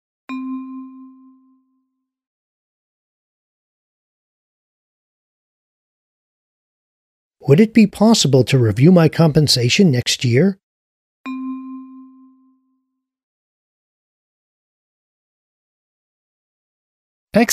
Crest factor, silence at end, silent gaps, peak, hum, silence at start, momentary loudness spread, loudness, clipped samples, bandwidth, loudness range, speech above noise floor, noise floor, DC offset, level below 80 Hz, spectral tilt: 20 dB; 0 s; 2.27-7.31 s, 10.63-11.24 s, 13.23-17.27 s; 0 dBFS; none; 0.3 s; 21 LU; -14 LUFS; under 0.1%; 15 kHz; 22 LU; 60 dB; -73 dBFS; under 0.1%; -54 dBFS; -5.5 dB/octave